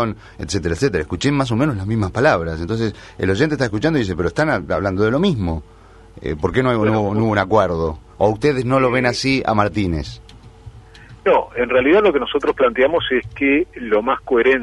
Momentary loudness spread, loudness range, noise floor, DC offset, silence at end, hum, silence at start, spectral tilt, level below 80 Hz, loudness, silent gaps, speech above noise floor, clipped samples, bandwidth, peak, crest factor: 8 LU; 3 LU; -41 dBFS; under 0.1%; 0 s; none; 0 s; -6 dB/octave; -38 dBFS; -18 LUFS; none; 23 dB; under 0.1%; 11.5 kHz; 0 dBFS; 18 dB